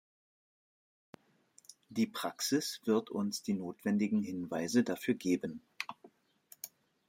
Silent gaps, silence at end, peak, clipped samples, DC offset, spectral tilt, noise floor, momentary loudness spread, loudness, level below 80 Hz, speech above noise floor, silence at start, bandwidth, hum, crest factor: none; 0.4 s; -16 dBFS; under 0.1%; under 0.1%; -4.5 dB/octave; -67 dBFS; 12 LU; -35 LUFS; -80 dBFS; 33 dB; 1.9 s; 16.5 kHz; none; 20 dB